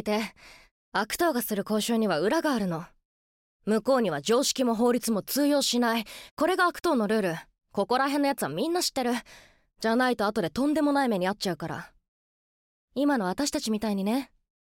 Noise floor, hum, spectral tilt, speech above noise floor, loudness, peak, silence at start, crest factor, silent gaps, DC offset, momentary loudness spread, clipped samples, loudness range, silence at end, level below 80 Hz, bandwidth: under -90 dBFS; none; -4 dB/octave; over 64 dB; -27 LUFS; -12 dBFS; 0 s; 14 dB; 0.71-0.92 s, 3.05-3.60 s, 6.31-6.37 s, 12.08-12.88 s; under 0.1%; 8 LU; under 0.1%; 3 LU; 0.4 s; -62 dBFS; 17 kHz